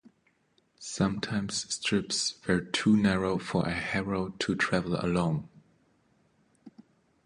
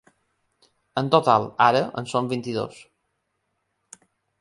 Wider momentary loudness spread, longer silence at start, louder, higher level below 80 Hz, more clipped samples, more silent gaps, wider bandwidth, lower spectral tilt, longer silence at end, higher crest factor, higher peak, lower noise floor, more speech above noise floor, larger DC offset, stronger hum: second, 7 LU vs 12 LU; second, 0.8 s vs 0.95 s; second, -29 LUFS vs -22 LUFS; first, -54 dBFS vs -66 dBFS; neither; neither; about the same, 11 kHz vs 11.5 kHz; about the same, -4.5 dB/octave vs -5.5 dB/octave; second, 0.45 s vs 1.7 s; about the same, 20 dB vs 22 dB; second, -12 dBFS vs -2 dBFS; second, -70 dBFS vs -75 dBFS; second, 41 dB vs 54 dB; neither; neither